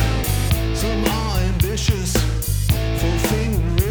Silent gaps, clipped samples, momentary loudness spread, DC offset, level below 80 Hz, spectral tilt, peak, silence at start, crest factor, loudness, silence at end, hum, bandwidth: none; under 0.1%; 2 LU; under 0.1%; -22 dBFS; -5 dB/octave; -4 dBFS; 0 s; 16 dB; -20 LUFS; 0 s; none; over 20 kHz